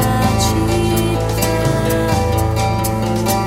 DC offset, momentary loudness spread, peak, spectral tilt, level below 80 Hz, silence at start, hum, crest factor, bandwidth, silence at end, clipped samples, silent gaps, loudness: under 0.1%; 2 LU; -2 dBFS; -5.5 dB/octave; -26 dBFS; 0 s; none; 14 dB; 16.5 kHz; 0 s; under 0.1%; none; -16 LUFS